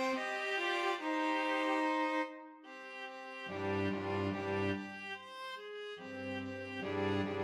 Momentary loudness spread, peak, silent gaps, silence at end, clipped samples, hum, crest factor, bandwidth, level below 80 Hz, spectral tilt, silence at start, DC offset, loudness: 12 LU; -22 dBFS; none; 0 s; under 0.1%; none; 16 dB; 13.5 kHz; -80 dBFS; -5.5 dB/octave; 0 s; under 0.1%; -37 LUFS